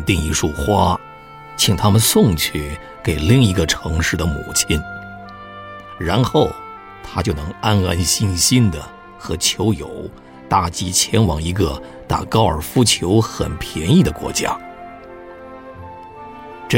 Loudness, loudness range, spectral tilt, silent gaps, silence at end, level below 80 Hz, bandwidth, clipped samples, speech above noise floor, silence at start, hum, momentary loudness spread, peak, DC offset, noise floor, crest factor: -17 LUFS; 5 LU; -4.5 dB/octave; none; 0 s; -32 dBFS; 16.5 kHz; under 0.1%; 21 dB; 0 s; none; 22 LU; -2 dBFS; under 0.1%; -38 dBFS; 16 dB